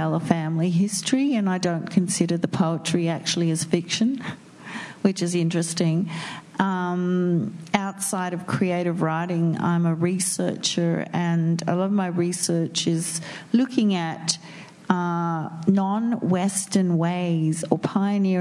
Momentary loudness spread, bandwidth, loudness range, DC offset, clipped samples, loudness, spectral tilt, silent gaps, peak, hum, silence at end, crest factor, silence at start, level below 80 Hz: 4 LU; 12 kHz; 2 LU; under 0.1%; under 0.1%; -23 LUFS; -5 dB/octave; none; 0 dBFS; none; 0 s; 22 dB; 0 s; -70 dBFS